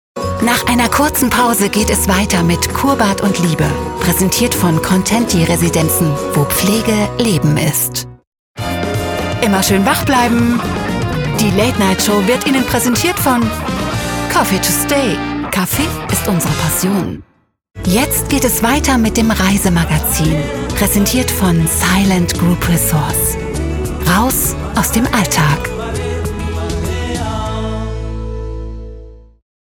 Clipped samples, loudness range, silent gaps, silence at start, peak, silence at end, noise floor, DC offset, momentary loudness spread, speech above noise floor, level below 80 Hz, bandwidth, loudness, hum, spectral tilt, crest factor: under 0.1%; 3 LU; 8.27-8.32 s, 8.39-8.55 s; 0.15 s; 0 dBFS; 0.4 s; -34 dBFS; under 0.1%; 8 LU; 21 dB; -28 dBFS; over 20 kHz; -14 LUFS; none; -4.5 dB/octave; 14 dB